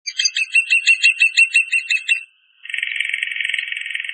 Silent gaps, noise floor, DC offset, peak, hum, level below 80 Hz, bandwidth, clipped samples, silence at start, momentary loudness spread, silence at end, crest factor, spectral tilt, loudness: none; -41 dBFS; under 0.1%; -2 dBFS; none; under -90 dBFS; 9.6 kHz; under 0.1%; 0.05 s; 11 LU; 0 s; 16 dB; 15 dB/octave; -15 LUFS